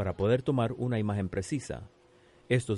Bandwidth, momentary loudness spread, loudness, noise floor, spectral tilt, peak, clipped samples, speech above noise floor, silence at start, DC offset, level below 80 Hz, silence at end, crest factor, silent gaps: 11.5 kHz; 9 LU; -31 LUFS; -60 dBFS; -7 dB/octave; -14 dBFS; under 0.1%; 31 dB; 0 s; under 0.1%; -54 dBFS; 0 s; 18 dB; none